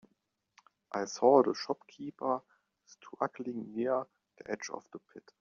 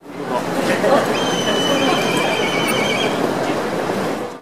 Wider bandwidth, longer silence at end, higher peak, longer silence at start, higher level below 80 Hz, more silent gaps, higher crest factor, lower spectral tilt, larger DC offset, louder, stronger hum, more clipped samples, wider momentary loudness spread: second, 7.4 kHz vs 16 kHz; first, 0.2 s vs 0 s; second, -10 dBFS vs -4 dBFS; first, 0.95 s vs 0 s; second, -82 dBFS vs -54 dBFS; neither; first, 24 dB vs 16 dB; about the same, -4 dB/octave vs -4 dB/octave; second, under 0.1% vs 0.8%; second, -33 LUFS vs -18 LUFS; neither; neither; first, 24 LU vs 6 LU